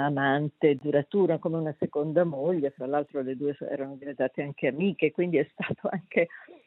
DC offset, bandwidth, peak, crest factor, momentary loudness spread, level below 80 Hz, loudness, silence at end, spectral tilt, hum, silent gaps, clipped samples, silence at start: under 0.1%; 4.1 kHz; -10 dBFS; 18 dB; 7 LU; -76 dBFS; -28 LUFS; 0.1 s; -10.5 dB/octave; none; none; under 0.1%; 0 s